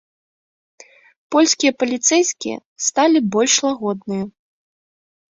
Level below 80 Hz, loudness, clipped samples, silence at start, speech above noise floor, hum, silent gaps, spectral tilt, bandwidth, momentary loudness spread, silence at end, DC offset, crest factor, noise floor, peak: -66 dBFS; -17 LUFS; under 0.1%; 1.3 s; over 73 dB; none; 2.65-2.76 s; -2.5 dB/octave; 8 kHz; 11 LU; 1 s; under 0.1%; 18 dB; under -90 dBFS; -2 dBFS